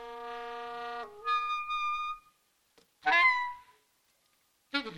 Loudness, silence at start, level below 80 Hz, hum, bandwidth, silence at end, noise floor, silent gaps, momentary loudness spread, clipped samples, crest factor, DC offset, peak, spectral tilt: -31 LUFS; 0 s; -68 dBFS; none; 16 kHz; 0 s; -72 dBFS; none; 17 LU; under 0.1%; 20 dB; under 0.1%; -14 dBFS; -2 dB/octave